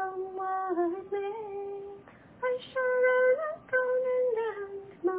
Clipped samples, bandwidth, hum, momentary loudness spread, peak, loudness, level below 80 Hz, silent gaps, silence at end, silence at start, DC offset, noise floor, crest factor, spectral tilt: under 0.1%; 4 kHz; none; 15 LU; -16 dBFS; -30 LUFS; -72 dBFS; none; 0 s; 0 s; under 0.1%; -51 dBFS; 14 dB; -8 dB/octave